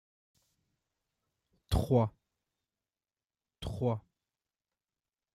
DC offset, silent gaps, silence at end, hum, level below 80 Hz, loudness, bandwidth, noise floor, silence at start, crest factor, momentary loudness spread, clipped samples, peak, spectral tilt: under 0.1%; none; 1.35 s; none; -50 dBFS; -33 LUFS; 15 kHz; under -90 dBFS; 1.7 s; 24 dB; 13 LU; under 0.1%; -14 dBFS; -7.5 dB/octave